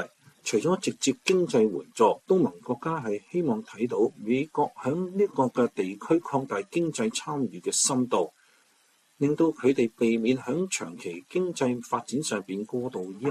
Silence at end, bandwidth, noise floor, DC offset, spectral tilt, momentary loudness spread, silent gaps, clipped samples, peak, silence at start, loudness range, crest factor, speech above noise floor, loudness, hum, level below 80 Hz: 0 s; 14 kHz; -65 dBFS; under 0.1%; -4.5 dB/octave; 8 LU; none; under 0.1%; -8 dBFS; 0 s; 2 LU; 18 dB; 38 dB; -27 LUFS; none; -72 dBFS